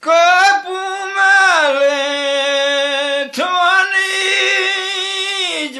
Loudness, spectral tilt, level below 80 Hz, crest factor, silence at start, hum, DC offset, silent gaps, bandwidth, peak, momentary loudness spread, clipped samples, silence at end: -13 LUFS; 1 dB/octave; -78 dBFS; 14 dB; 0 s; none; under 0.1%; none; 13 kHz; 0 dBFS; 8 LU; under 0.1%; 0 s